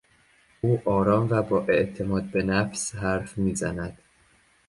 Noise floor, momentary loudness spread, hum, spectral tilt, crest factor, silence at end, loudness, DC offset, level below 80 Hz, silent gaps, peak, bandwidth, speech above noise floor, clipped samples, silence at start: -61 dBFS; 8 LU; none; -6 dB/octave; 18 dB; 0.75 s; -25 LUFS; under 0.1%; -48 dBFS; none; -8 dBFS; 11.5 kHz; 37 dB; under 0.1%; 0.65 s